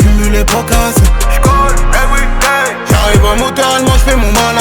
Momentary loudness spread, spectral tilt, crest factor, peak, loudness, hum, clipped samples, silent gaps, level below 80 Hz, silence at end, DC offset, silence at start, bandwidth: 3 LU; -4.5 dB/octave; 8 dB; 0 dBFS; -10 LUFS; none; under 0.1%; none; -12 dBFS; 0 s; under 0.1%; 0 s; 19.5 kHz